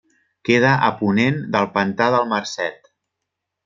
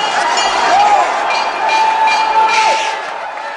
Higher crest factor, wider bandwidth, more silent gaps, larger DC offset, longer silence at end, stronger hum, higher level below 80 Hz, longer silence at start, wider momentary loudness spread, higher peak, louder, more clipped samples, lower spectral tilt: first, 18 dB vs 12 dB; second, 7.6 kHz vs 11.5 kHz; neither; neither; first, 0.9 s vs 0 s; neither; second, -62 dBFS vs -54 dBFS; first, 0.45 s vs 0 s; about the same, 10 LU vs 8 LU; about the same, -2 dBFS vs -2 dBFS; second, -19 LUFS vs -12 LUFS; neither; first, -6 dB/octave vs 0 dB/octave